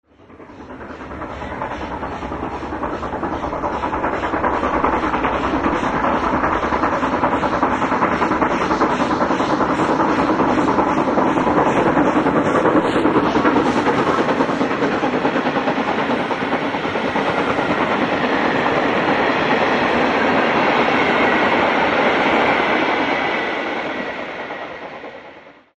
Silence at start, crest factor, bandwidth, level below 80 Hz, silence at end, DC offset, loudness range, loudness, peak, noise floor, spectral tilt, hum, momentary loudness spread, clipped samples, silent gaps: 0.3 s; 16 dB; 10 kHz; -42 dBFS; 0.25 s; under 0.1%; 6 LU; -18 LUFS; -2 dBFS; -42 dBFS; -5.5 dB/octave; none; 11 LU; under 0.1%; none